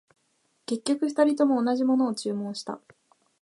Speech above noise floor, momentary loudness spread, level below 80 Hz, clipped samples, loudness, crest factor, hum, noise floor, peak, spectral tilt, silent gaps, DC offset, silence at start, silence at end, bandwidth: 46 dB; 15 LU; -80 dBFS; under 0.1%; -26 LUFS; 18 dB; none; -71 dBFS; -10 dBFS; -5 dB/octave; none; under 0.1%; 0.7 s; 0.65 s; 11.5 kHz